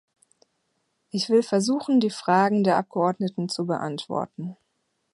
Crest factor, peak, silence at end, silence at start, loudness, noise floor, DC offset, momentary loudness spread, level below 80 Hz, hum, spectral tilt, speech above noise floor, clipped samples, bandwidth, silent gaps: 18 dB; -6 dBFS; 0.6 s; 1.15 s; -24 LUFS; -74 dBFS; under 0.1%; 11 LU; -72 dBFS; none; -5.5 dB/octave; 51 dB; under 0.1%; 11.5 kHz; none